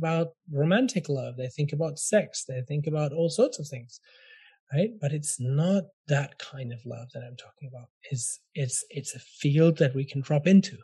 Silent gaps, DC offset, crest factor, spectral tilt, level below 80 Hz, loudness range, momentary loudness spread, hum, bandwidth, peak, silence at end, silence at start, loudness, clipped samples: 4.60-4.67 s, 5.93-6.04 s, 7.90-8.01 s; under 0.1%; 18 dB; -6 dB/octave; -74 dBFS; 6 LU; 18 LU; none; 12.5 kHz; -10 dBFS; 0.05 s; 0 s; -27 LUFS; under 0.1%